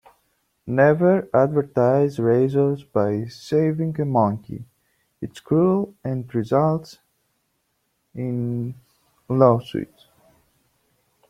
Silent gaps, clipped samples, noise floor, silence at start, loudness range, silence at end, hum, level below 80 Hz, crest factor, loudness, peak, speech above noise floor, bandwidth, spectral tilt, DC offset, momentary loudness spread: none; under 0.1%; -71 dBFS; 0.65 s; 5 LU; 1.45 s; none; -60 dBFS; 20 dB; -21 LUFS; -2 dBFS; 51 dB; 14 kHz; -9 dB/octave; under 0.1%; 16 LU